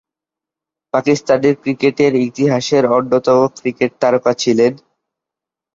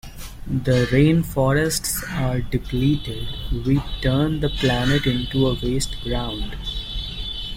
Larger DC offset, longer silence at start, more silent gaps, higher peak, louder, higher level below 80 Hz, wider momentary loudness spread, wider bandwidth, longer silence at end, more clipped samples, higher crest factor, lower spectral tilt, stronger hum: neither; first, 0.95 s vs 0.05 s; neither; first, 0 dBFS vs -4 dBFS; first, -15 LUFS vs -22 LUFS; second, -58 dBFS vs -32 dBFS; second, 5 LU vs 11 LU; second, 7.8 kHz vs 16.5 kHz; first, 1 s vs 0 s; neither; about the same, 14 dB vs 18 dB; about the same, -5.5 dB/octave vs -5.5 dB/octave; neither